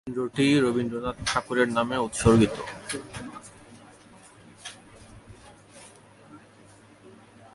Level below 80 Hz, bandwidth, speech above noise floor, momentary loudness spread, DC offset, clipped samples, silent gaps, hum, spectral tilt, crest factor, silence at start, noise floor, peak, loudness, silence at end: -48 dBFS; 11.5 kHz; 28 dB; 26 LU; under 0.1%; under 0.1%; none; none; -5 dB/octave; 22 dB; 0.05 s; -53 dBFS; -6 dBFS; -25 LUFS; 0.45 s